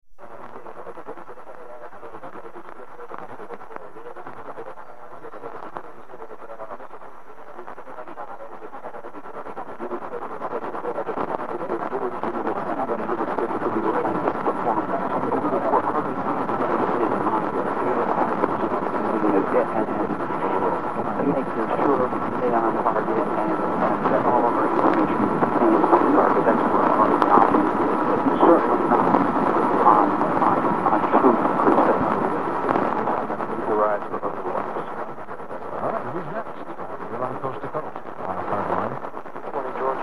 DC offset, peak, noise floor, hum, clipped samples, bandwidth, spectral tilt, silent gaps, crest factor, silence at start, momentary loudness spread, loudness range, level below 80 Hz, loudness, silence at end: 2%; 0 dBFS; -43 dBFS; none; under 0.1%; 10.5 kHz; -8 dB/octave; none; 22 dB; 0 s; 21 LU; 20 LU; -58 dBFS; -22 LUFS; 0 s